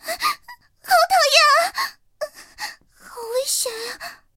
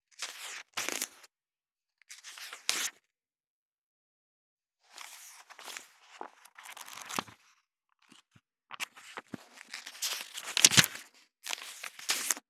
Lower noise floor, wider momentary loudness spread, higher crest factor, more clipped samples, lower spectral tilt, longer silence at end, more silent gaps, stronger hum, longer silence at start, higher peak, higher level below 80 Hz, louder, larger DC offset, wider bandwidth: second, -45 dBFS vs under -90 dBFS; second, 20 LU vs 25 LU; second, 22 dB vs 36 dB; neither; second, 2 dB/octave vs -0.5 dB/octave; about the same, 0.2 s vs 0.1 s; second, none vs 3.47-4.57 s; neither; second, 0.05 s vs 0.2 s; about the same, 0 dBFS vs -2 dBFS; first, -62 dBFS vs -80 dBFS; first, -18 LUFS vs -30 LUFS; neither; about the same, 17 kHz vs 18.5 kHz